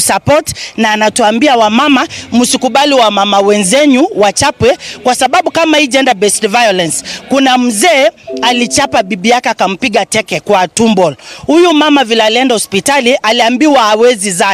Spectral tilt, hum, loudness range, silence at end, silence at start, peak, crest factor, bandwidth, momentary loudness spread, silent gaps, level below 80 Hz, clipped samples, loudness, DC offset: -3 dB/octave; none; 2 LU; 0 s; 0 s; 0 dBFS; 10 dB; 16 kHz; 5 LU; none; -44 dBFS; 0.4%; -9 LUFS; under 0.1%